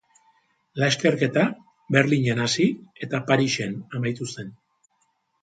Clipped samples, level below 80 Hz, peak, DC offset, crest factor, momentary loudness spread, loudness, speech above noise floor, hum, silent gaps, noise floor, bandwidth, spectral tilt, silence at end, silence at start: under 0.1%; -64 dBFS; -4 dBFS; under 0.1%; 20 dB; 15 LU; -23 LUFS; 47 dB; none; none; -70 dBFS; 9.4 kHz; -5 dB/octave; 0.9 s; 0.75 s